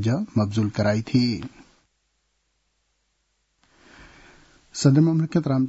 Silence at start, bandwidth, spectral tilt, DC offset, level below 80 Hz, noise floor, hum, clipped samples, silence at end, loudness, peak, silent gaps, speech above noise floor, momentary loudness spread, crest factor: 0 s; 8 kHz; -7 dB/octave; under 0.1%; -58 dBFS; -71 dBFS; none; under 0.1%; 0 s; -22 LUFS; -6 dBFS; none; 51 dB; 12 LU; 20 dB